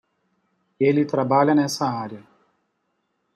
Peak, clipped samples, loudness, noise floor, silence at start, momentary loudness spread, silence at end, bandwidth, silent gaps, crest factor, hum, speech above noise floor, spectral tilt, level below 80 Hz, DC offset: -6 dBFS; under 0.1%; -21 LUFS; -73 dBFS; 0.8 s; 11 LU; 1.15 s; 14 kHz; none; 18 dB; none; 53 dB; -6 dB/octave; -70 dBFS; under 0.1%